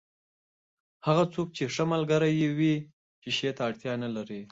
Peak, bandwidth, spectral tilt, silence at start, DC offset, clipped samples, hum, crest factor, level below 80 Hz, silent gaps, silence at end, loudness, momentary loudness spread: -10 dBFS; 8 kHz; -6 dB/octave; 1.05 s; under 0.1%; under 0.1%; none; 18 dB; -68 dBFS; 2.93-3.22 s; 0.05 s; -29 LUFS; 9 LU